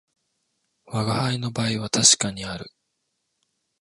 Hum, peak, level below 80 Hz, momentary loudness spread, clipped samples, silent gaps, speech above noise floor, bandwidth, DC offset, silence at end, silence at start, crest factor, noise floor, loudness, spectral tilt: none; -2 dBFS; -58 dBFS; 17 LU; under 0.1%; none; 53 dB; 11.5 kHz; under 0.1%; 1.15 s; 0.9 s; 26 dB; -76 dBFS; -21 LUFS; -2.5 dB/octave